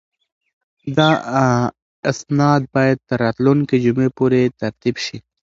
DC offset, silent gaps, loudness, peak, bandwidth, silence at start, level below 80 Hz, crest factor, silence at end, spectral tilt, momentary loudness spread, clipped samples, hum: under 0.1%; 1.82-2.03 s; -18 LUFS; 0 dBFS; 7.8 kHz; 0.85 s; -54 dBFS; 18 dB; 0.35 s; -6.5 dB/octave; 9 LU; under 0.1%; none